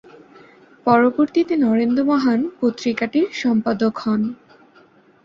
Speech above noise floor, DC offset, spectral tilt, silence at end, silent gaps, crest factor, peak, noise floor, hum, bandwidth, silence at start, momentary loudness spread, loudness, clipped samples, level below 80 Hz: 34 dB; under 0.1%; -6.5 dB/octave; 0.9 s; none; 18 dB; -2 dBFS; -52 dBFS; none; 7.4 kHz; 0.85 s; 7 LU; -19 LUFS; under 0.1%; -62 dBFS